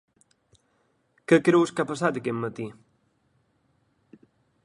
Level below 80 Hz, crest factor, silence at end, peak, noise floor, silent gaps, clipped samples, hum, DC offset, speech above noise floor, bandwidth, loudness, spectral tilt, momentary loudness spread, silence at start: -68 dBFS; 22 dB; 1.9 s; -6 dBFS; -69 dBFS; none; under 0.1%; none; under 0.1%; 46 dB; 11.5 kHz; -24 LUFS; -6 dB/octave; 19 LU; 1.3 s